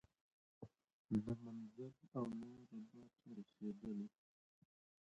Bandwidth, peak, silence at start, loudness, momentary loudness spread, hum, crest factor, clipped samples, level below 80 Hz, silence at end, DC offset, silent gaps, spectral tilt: 8.2 kHz; -30 dBFS; 0.6 s; -50 LUFS; 19 LU; none; 20 dB; under 0.1%; -76 dBFS; 0.95 s; under 0.1%; 0.93-1.05 s; -9 dB/octave